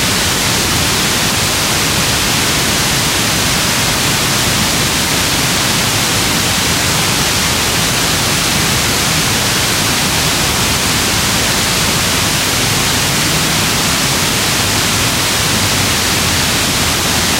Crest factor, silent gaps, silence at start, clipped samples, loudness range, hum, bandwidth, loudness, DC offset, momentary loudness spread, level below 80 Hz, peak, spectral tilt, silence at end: 14 dB; none; 0 s; under 0.1%; 0 LU; none; 16 kHz; -11 LUFS; under 0.1%; 0 LU; -30 dBFS; 0 dBFS; -2 dB/octave; 0 s